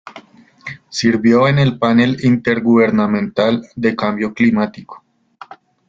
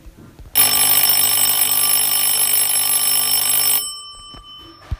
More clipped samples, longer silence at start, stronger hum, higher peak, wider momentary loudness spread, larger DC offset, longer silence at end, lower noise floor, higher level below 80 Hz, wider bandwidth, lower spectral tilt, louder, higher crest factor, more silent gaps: neither; about the same, 0.05 s vs 0.05 s; neither; about the same, -2 dBFS vs 0 dBFS; first, 12 LU vs 5 LU; neither; first, 0.9 s vs 0.05 s; about the same, -42 dBFS vs -40 dBFS; second, -52 dBFS vs -42 dBFS; second, 7.6 kHz vs 17 kHz; first, -6.5 dB/octave vs 1 dB/octave; about the same, -15 LUFS vs -13 LUFS; about the same, 14 dB vs 18 dB; neither